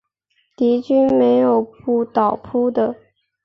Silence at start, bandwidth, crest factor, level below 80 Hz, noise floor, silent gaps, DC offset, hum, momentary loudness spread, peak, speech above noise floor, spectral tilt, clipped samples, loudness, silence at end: 0.6 s; 6 kHz; 16 dB; -58 dBFS; -66 dBFS; none; under 0.1%; none; 7 LU; -2 dBFS; 50 dB; -8.5 dB/octave; under 0.1%; -17 LUFS; 0.5 s